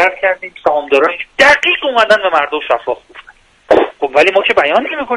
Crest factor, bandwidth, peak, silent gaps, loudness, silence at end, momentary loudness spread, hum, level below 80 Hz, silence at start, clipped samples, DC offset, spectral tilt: 12 dB; 11.5 kHz; 0 dBFS; none; -12 LUFS; 0 s; 8 LU; none; -48 dBFS; 0 s; 0.2%; under 0.1%; -2.5 dB/octave